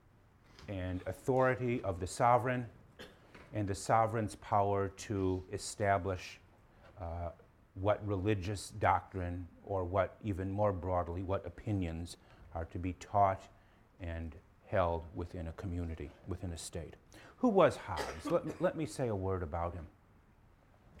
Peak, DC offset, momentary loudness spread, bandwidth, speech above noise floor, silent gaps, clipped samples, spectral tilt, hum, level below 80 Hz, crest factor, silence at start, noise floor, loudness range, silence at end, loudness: -14 dBFS; under 0.1%; 16 LU; 14 kHz; 29 dB; none; under 0.1%; -6.5 dB/octave; none; -56 dBFS; 22 dB; 0.6 s; -64 dBFS; 4 LU; 0 s; -36 LUFS